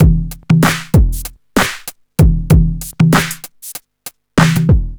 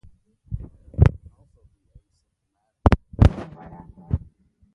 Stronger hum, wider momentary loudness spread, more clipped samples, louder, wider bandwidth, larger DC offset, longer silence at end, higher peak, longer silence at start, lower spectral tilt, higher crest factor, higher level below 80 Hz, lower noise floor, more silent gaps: neither; second, 17 LU vs 22 LU; neither; first, -14 LUFS vs -21 LUFS; first, over 20 kHz vs 6.8 kHz; neither; second, 0 s vs 0.6 s; about the same, 0 dBFS vs 0 dBFS; second, 0 s vs 0.5 s; second, -6 dB/octave vs -9 dB/octave; second, 12 dB vs 24 dB; first, -18 dBFS vs -28 dBFS; second, -37 dBFS vs -75 dBFS; neither